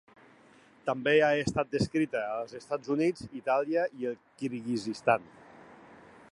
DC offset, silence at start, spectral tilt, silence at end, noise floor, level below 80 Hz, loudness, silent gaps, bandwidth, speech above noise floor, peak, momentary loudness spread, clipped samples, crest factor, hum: under 0.1%; 0.85 s; -5.5 dB/octave; 0.4 s; -59 dBFS; -62 dBFS; -30 LUFS; none; 11.5 kHz; 29 dB; -10 dBFS; 12 LU; under 0.1%; 20 dB; none